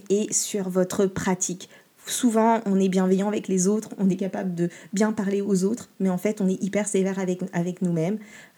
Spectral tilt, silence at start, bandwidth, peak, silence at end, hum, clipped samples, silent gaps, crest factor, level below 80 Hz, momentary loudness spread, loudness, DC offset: -5.5 dB/octave; 0.05 s; 18 kHz; -8 dBFS; 0.1 s; none; under 0.1%; none; 16 dB; -66 dBFS; 7 LU; -24 LUFS; under 0.1%